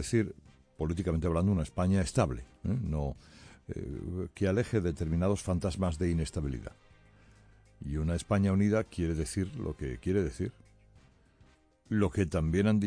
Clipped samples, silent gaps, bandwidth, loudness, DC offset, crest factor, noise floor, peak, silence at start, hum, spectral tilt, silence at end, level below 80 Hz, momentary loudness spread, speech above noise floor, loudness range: under 0.1%; none; 10.5 kHz; -32 LUFS; under 0.1%; 18 dB; -63 dBFS; -14 dBFS; 0 s; none; -7 dB/octave; 0 s; -44 dBFS; 11 LU; 33 dB; 3 LU